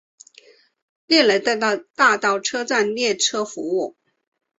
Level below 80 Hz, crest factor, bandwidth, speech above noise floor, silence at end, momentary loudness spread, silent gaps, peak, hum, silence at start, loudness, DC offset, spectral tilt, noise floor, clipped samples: -70 dBFS; 18 dB; 8.2 kHz; 32 dB; 0.7 s; 9 LU; none; -4 dBFS; none; 1.1 s; -19 LUFS; under 0.1%; -1.5 dB/octave; -52 dBFS; under 0.1%